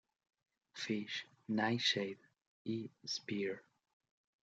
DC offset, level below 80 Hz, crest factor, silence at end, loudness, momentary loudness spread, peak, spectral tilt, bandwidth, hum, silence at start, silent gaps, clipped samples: under 0.1%; -86 dBFS; 22 dB; 0.8 s; -39 LUFS; 16 LU; -20 dBFS; -4 dB/octave; 8.8 kHz; none; 0.75 s; 2.47-2.65 s; under 0.1%